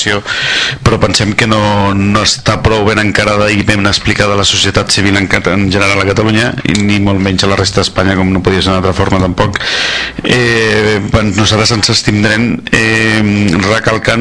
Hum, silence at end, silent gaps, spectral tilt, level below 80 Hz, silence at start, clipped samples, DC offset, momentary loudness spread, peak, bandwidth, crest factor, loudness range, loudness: none; 0 s; none; -4.5 dB/octave; -30 dBFS; 0 s; 0.6%; 0.4%; 3 LU; 0 dBFS; 11 kHz; 10 dB; 1 LU; -10 LUFS